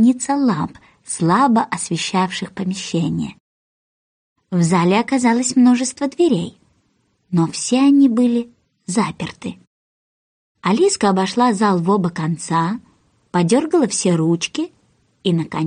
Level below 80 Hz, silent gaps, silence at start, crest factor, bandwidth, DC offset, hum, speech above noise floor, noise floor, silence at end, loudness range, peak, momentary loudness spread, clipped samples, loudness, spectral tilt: -60 dBFS; 3.40-4.36 s, 9.67-10.55 s; 0 s; 14 dB; 10 kHz; under 0.1%; none; 47 dB; -64 dBFS; 0 s; 3 LU; -4 dBFS; 12 LU; under 0.1%; -18 LUFS; -5.5 dB/octave